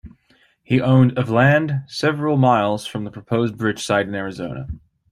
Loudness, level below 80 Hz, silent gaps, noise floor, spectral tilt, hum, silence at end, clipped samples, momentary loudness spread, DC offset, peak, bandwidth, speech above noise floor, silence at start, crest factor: -19 LUFS; -48 dBFS; none; -59 dBFS; -6.5 dB/octave; none; 0.35 s; under 0.1%; 14 LU; under 0.1%; -2 dBFS; 11.5 kHz; 40 dB; 0.05 s; 18 dB